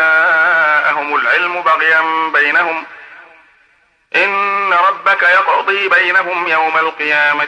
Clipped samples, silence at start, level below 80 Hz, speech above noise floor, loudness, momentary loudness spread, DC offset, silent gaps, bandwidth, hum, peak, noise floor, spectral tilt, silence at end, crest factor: under 0.1%; 0 s; -70 dBFS; 41 dB; -12 LUFS; 5 LU; under 0.1%; none; 10 kHz; none; -2 dBFS; -54 dBFS; -3 dB/octave; 0 s; 12 dB